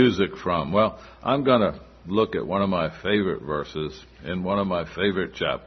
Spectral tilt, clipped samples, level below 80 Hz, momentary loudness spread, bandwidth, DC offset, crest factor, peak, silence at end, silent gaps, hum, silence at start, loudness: -7 dB/octave; under 0.1%; -50 dBFS; 11 LU; 6.4 kHz; under 0.1%; 18 dB; -6 dBFS; 0 s; none; none; 0 s; -25 LUFS